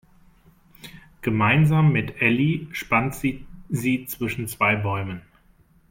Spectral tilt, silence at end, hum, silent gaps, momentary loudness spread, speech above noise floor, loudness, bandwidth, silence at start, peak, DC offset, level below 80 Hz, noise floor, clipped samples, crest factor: -6.5 dB/octave; 0.7 s; none; none; 18 LU; 35 dB; -22 LUFS; 16.5 kHz; 0.85 s; -4 dBFS; under 0.1%; -50 dBFS; -57 dBFS; under 0.1%; 20 dB